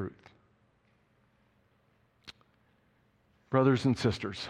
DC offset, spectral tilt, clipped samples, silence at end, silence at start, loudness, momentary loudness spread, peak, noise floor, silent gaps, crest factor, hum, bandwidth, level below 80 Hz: under 0.1%; -7 dB/octave; under 0.1%; 0 s; 0 s; -29 LUFS; 26 LU; -12 dBFS; -70 dBFS; none; 22 dB; none; 10.5 kHz; -62 dBFS